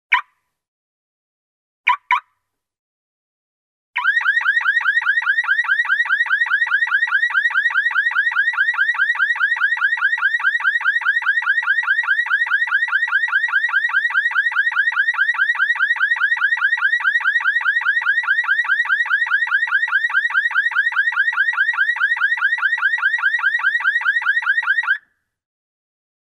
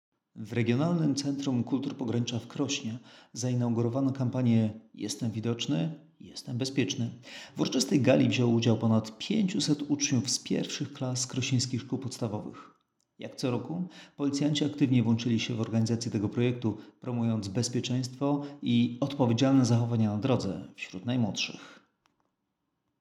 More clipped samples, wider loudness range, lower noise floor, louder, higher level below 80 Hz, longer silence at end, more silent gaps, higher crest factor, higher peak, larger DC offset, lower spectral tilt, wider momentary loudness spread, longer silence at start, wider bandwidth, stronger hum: neither; about the same, 3 LU vs 5 LU; second, -73 dBFS vs -81 dBFS; first, -16 LUFS vs -29 LUFS; about the same, -74 dBFS vs -74 dBFS; first, 1.4 s vs 1.25 s; first, 0.68-1.84 s, 2.79-3.94 s vs none; about the same, 18 dB vs 20 dB; first, -2 dBFS vs -10 dBFS; neither; second, 4 dB/octave vs -5.5 dB/octave; second, 1 LU vs 12 LU; second, 0.1 s vs 0.35 s; second, 11 kHz vs 13.5 kHz; neither